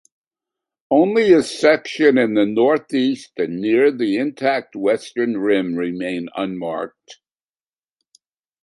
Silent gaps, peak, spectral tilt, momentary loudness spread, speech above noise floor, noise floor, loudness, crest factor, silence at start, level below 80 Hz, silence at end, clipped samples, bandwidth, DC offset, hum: none; -2 dBFS; -5.5 dB/octave; 10 LU; over 72 dB; under -90 dBFS; -18 LUFS; 18 dB; 0.9 s; -64 dBFS; 1.5 s; under 0.1%; 11.5 kHz; under 0.1%; none